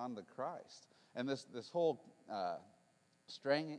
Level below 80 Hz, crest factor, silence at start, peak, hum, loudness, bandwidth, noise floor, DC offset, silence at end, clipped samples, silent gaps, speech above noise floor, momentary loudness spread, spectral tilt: under -90 dBFS; 22 dB; 0 s; -22 dBFS; none; -42 LUFS; 10.5 kHz; -74 dBFS; under 0.1%; 0 s; under 0.1%; none; 32 dB; 16 LU; -5.5 dB/octave